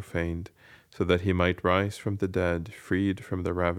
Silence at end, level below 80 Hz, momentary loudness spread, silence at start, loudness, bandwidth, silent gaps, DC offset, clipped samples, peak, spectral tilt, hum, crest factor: 0 s; -48 dBFS; 9 LU; 0 s; -28 LUFS; 14.5 kHz; none; under 0.1%; under 0.1%; -8 dBFS; -7 dB/octave; none; 20 dB